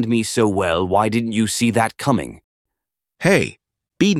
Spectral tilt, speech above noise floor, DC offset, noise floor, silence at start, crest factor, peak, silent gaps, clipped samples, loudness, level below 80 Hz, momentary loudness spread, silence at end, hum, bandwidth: -5 dB/octave; 65 dB; under 0.1%; -83 dBFS; 0 s; 16 dB; -4 dBFS; 2.44-2.65 s; under 0.1%; -19 LUFS; -50 dBFS; 5 LU; 0 s; none; 15 kHz